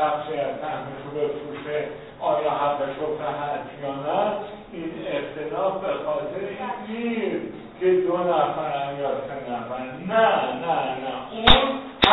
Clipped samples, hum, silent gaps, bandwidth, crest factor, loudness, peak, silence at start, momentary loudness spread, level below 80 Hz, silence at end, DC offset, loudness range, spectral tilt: under 0.1%; none; none; 6 kHz; 24 dB; -25 LUFS; 0 dBFS; 0 s; 11 LU; -42 dBFS; 0 s; under 0.1%; 5 LU; -6.5 dB/octave